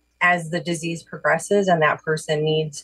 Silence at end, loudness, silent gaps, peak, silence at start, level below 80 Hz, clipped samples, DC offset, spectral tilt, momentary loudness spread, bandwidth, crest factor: 0 s; -21 LUFS; none; -8 dBFS; 0.2 s; -64 dBFS; under 0.1%; under 0.1%; -4.5 dB/octave; 8 LU; 12.5 kHz; 14 dB